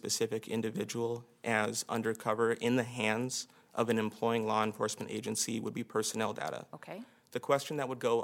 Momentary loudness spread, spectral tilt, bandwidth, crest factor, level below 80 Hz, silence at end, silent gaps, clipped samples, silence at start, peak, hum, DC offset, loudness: 9 LU; -4 dB/octave; 17 kHz; 20 dB; -80 dBFS; 0 s; none; under 0.1%; 0.05 s; -14 dBFS; none; under 0.1%; -34 LUFS